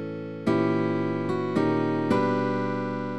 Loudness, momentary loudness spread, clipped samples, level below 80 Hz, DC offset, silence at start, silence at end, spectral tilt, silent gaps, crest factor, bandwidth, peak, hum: -26 LUFS; 5 LU; under 0.1%; -60 dBFS; 0.4%; 0 s; 0 s; -8 dB/octave; none; 14 dB; 11 kHz; -12 dBFS; none